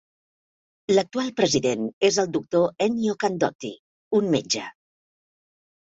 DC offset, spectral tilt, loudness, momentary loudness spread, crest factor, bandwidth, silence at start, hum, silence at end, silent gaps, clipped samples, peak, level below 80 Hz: under 0.1%; -4 dB/octave; -23 LUFS; 6 LU; 20 dB; 8.2 kHz; 0.9 s; none; 1.15 s; 1.93-2.01 s, 3.55-3.59 s, 3.79-4.11 s; under 0.1%; -6 dBFS; -64 dBFS